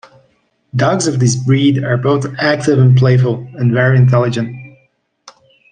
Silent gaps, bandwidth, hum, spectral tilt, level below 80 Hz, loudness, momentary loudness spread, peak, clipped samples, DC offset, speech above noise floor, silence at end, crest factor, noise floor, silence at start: none; 9.4 kHz; none; -6.5 dB/octave; -52 dBFS; -13 LUFS; 8 LU; 0 dBFS; under 0.1%; under 0.1%; 46 dB; 1.05 s; 12 dB; -58 dBFS; 0.75 s